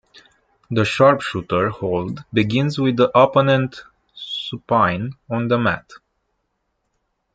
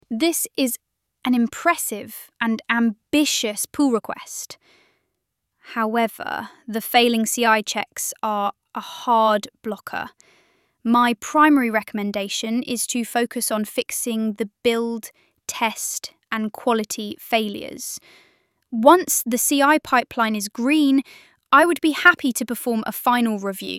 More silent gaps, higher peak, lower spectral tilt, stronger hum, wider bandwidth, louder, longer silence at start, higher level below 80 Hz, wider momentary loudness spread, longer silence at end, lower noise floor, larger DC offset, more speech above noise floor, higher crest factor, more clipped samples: neither; about the same, -2 dBFS vs -2 dBFS; first, -6.5 dB/octave vs -2.5 dB/octave; neither; second, 9.2 kHz vs 17 kHz; about the same, -19 LUFS vs -21 LUFS; first, 0.7 s vs 0.1 s; first, -56 dBFS vs -64 dBFS; second, 12 LU vs 15 LU; first, 1.4 s vs 0 s; second, -72 dBFS vs -77 dBFS; neither; about the same, 54 dB vs 56 dB; about the same, 18 dB vs 20 dB; neither